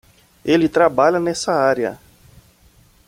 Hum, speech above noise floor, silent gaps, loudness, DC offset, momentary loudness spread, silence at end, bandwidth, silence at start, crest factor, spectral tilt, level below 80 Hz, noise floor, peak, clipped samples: none; 36 dB; none; -17 LUFS; under 0.1%; 9 LU; 1.1 s; 16 kHz; 0.45 s; 18 dB; -5 dB/octave; -54 dBFS; -52 dBFS; -2 dBFS; under 0.1%